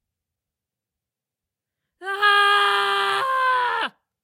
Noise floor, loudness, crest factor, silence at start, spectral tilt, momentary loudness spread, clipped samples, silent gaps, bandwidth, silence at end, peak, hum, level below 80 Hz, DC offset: -87 dBFS; -19 LUFS; 18 dB; 2 s; -0.5 dB/octave; 14 LU; under 0.1%; none; 16 kHz; 0.35 s; -4 dBFS; none; -74 dBFS; under 0.1%